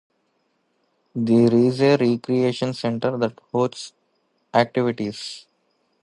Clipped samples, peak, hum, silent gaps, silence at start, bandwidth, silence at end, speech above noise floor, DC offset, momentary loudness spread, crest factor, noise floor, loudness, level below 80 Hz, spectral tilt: under 0.1%; -2 dBFS; none; none; 1.15 s; 11 kHz; 0.65 s; 49 dB; under 0.1%; 17 LU; 20 dB; -69 dBFS; -21 LUFS; -64 dBFS; -6.5 dB/octave